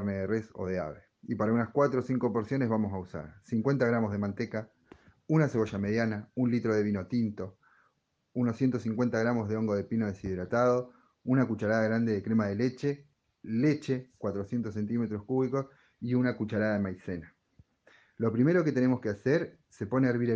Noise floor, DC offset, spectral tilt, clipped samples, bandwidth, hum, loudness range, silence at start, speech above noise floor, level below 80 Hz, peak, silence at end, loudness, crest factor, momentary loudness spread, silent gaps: -75 dBFS; under 0.1%; -8.5 dB/octave; under 0.1%; 7.6 kHz; none; 3 LU; 0 s; 46 dB; -66 dBFS; -12 dBFS; 0 s; -30 LUFS; 18 dB; 12 LU; none